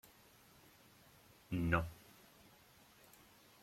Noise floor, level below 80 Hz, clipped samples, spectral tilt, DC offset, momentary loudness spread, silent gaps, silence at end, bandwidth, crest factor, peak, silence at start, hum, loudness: -66 dBFS; -60 dBFS; under 0.1%; -6.5 dB/octave; under 0.1%; 27 LU; none; 1.7 s; 16.5 kHz; 26 dB; -20 dBFS; 1.5 s; none; -39 LUFS